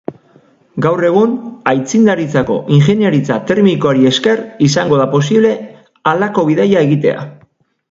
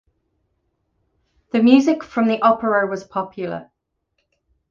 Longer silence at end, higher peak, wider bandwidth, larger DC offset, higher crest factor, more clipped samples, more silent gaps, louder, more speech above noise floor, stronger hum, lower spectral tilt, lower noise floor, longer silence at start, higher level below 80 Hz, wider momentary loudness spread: second, 0.6 s vs 1.1 s; about the same, 0 dBFS vs -2 dBFS; about the same, 7.8 kHz vs 7.2 kHz; neither; second, 12 dB vs 20 dB; neither; neither; first, -12 LUFS vs -18 LUFS; second, 40 dB vs 55 dB; neither; about the same, -6.5 dB/octave vs -6 dB/octave; second, -52 dBFS vs -73 dBFS; second, 0.1 s vs 1.55 s; first, -52 dBFS vs -62 dBFS; second, 7 LU vs 15 LU